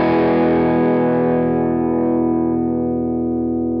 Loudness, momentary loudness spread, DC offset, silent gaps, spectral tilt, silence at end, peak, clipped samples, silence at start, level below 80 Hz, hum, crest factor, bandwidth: -17 LUFS; 5 LU; under 0.1%; none; -11.5 dB/octave; 0 s; -6 dBFS; under 0.1%; 0 s; -46 dBFS; none; 10 dB; 5.2 kHz